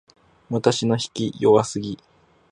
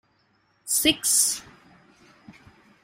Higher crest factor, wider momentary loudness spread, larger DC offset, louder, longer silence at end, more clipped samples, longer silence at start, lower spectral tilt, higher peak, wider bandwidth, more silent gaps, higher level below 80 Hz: about the same, 20 dB vs 22 dB; about the same, 13 LU vs 14 LU; neither; about the same, -21 LUFS vs -21 LUFS; about the same, 0.55 s vs 0.5 s; neither; second, 0.5 s vs 0.65 s; first, -5.5 dB/octave vs 0 dB/octave; first, -2 dBFS vs -6 dBFS; second, 10.5 kHz vs 16 kHz; neither; about the same, -58 dBFS vs -58 dBFS